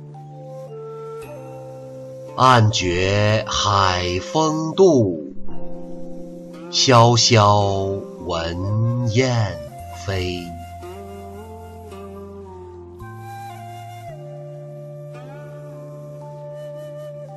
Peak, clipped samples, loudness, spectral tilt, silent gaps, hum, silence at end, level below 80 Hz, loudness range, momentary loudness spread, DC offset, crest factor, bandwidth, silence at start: -2 dBFS; under 0.1%; -18 LUFS; -5 dB/octave; none; none; 0 s; -46 dBFS; 19 LU; 22 LU; under 0.1%; 18 dB; 12.5 kHz; 0 s